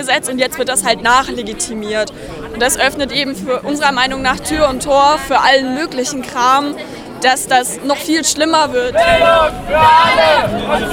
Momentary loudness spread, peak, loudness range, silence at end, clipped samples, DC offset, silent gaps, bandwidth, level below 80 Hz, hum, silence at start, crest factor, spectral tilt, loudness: 10 LU; 0 dBFS; 4 LU; 0 s; under 0.1%; under 0.1%; none; 17.5 kHz; -36 dBFS; none; 0 s; 14 dB; -2.5 dB/octave; -13 LUFS